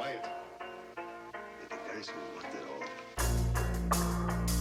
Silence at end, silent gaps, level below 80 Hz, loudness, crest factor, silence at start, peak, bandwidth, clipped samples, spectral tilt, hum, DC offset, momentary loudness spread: 0 s; none; -40 dBFS; -37 LUFS; 18 dB; 0 s; -18 dBFS; 16.5 kHz; under 0.1%; -5 dB/octave; none; under 0.1%; 13 LU